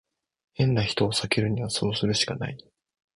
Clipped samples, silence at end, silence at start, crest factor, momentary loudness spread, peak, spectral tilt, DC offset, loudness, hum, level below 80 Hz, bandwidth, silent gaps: under 0.1%; 0.6 s; 0.6 s; 20 dB; 11 LU; -8 dBFS; -4.5 dB/octave; under 0.1%; -26 LUFS; none; -52 dBFS; 11.5 kHz; none